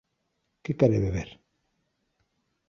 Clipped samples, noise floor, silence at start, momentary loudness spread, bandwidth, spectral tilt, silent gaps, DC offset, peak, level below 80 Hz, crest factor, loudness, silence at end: under 0.1%; -77 dBFS; 0.7 s; 19 LU; 7 kHz; -8.5 dB/octave; none; under 0.1%; -6 dBFS; -48 dBFS; 24 dB; -26 LUFS; 1.4 s